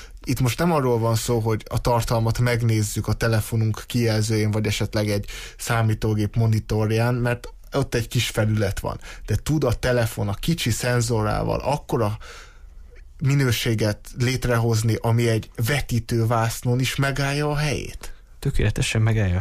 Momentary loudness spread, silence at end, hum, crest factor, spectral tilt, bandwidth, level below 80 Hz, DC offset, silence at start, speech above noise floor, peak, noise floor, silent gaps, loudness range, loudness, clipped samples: 7 LU; 0 s; none; 12 dB; -5.5 dB/octave; 15.5 kHz; -36 dBFS; under 0.1%; 0 s; 21 dB; -10 dBFS; -42 dBFS; none; 2 LU; -23 LUFS; under 0.1%